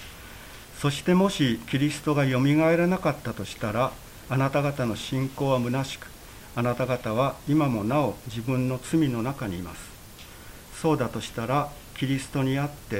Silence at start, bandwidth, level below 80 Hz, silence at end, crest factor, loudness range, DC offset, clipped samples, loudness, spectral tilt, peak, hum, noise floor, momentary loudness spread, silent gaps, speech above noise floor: 0 s; 16 kHz; -50 dBFS; 0 s; 16 dB; 5 LU; under 0.1%; under 0.1%; -26 LUFS; -6 dB/octave; -10 dBFS; none; -45 dBFS; 20 LU; none; 20 dB